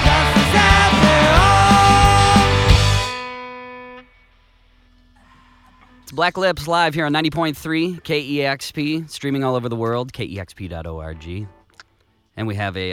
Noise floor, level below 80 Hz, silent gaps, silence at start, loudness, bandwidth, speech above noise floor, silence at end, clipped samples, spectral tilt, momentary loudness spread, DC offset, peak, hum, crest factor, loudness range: -61 dBFS; -28 dBFS; none; 0 s; -16 LUFS; 16.5 kHz; 39 dB; 0 s; under 0.1%; -5 dB/octave; 20 LU; under 0.1%; 0 dBFS; none; 18 dB; 14 LU